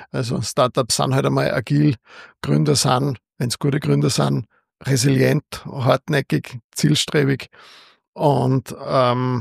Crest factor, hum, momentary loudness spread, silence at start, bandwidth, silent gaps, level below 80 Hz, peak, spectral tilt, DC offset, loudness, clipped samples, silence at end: 18 dB; none; 9 LU; 0 s; 15 kHz; 6.64-6.70 s, 8.08-8.13 s; -54 dBFS; -2 dBFS; -5.5 dB/octave; under 0.1%; -19 LUFS; under 0.1%; 0 s